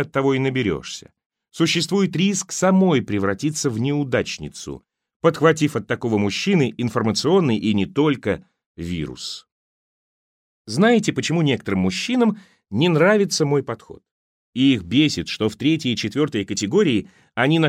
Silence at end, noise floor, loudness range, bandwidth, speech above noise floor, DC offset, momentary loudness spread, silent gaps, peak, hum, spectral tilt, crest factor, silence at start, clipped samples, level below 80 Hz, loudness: 0 s; under -90 dBFS; 4 LU; 15 kHz; over 70 dB; under 0.1%; 13 LU; 1.26-1.30 s, 5.16-5.20 s, 8.66-8.75 s, 9.52-10.65 s, 14.11-14.53 s; -2 dBFS; none; -5 dB/octave; 18 dB; 0 s; under 0.1%; -54 dBFS; -20 LUFS